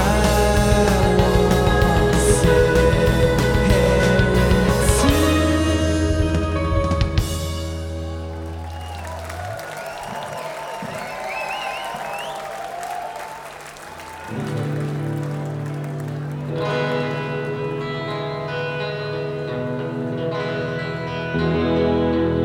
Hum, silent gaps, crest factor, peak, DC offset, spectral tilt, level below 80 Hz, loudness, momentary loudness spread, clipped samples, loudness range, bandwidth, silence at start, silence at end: none; none; 18 dB; -2 dBFS; under 0.1%; -5.5 dB/octave; -28 dBFS; -21 LUFS; 14 LU; under 0.1%; 12 LU; 18.5 kHz; 0 s; 0 s